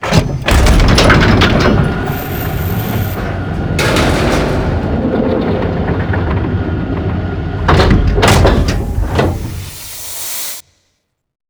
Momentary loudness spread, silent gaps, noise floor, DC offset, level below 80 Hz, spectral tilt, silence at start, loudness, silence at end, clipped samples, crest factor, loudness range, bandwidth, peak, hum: 11 LU; none; -65 dBFS; under 0.1%; -18 dBFS; -5.5 dB/octave; 0 s; -13 LUFS; 0.9 s; under 0.1%; 12 dB; 4 LU; over 20 kHz; 0 dBFS; none